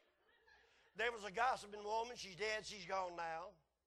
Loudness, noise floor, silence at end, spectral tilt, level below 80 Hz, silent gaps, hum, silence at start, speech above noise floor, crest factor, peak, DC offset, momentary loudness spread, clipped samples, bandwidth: -43 LUFS; -75 dBFS; 0.35 s; -2 dB/octave; -76 dBFS; none; none; 0.5 s; 31 dB; 20 dB; -26 dBFS; under 0.1%; 9 LU; under 0.1%; 12 kHz